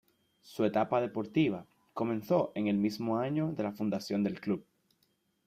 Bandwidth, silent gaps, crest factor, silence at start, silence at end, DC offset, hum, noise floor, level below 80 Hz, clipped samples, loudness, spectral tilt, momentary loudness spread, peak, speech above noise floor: 15.5 kHz; none; 18 dB; 0.45 s; 0.85 s; under 0.1%; none; -75 dBFS; -72 dBFS; under 0.1%; -32 LUFS; -7.5 dB/octave; 7 LU; -16 dBFS; 44 dB